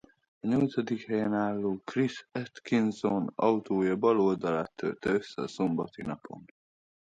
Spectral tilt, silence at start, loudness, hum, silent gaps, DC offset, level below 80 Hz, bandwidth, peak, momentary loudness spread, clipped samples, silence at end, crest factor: -7 dB/octave; 0.45 s; -30 LUFS; none; none; under 0.1%; -66 dBFS; 9 kHz; -12 dBFS; 12 LU; under 0.1%; 0.6 s; 18 dB